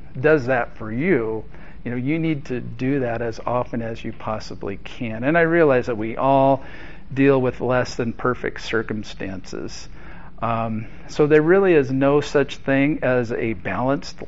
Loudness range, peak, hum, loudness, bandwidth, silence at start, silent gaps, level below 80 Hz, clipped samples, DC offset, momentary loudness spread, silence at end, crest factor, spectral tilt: 7 LU; -4 dBFS; none; -21 LUFS; 7.8 kHz; 0 s; none; -44 dBFS; under 0.1%; 2%; 15 LU; 0 s; 18 dB; -6 dB/octave